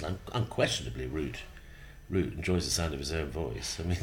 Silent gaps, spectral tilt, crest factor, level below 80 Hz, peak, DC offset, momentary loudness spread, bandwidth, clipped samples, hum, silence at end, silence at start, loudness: none; -4.5 dB/octave; 20 dB; -44 dBFS; -12 dBFS; under 0.1%; 17 LU; 17.5 kHz; under 0.1%; none; 0 s; 0 s; -33 LUFS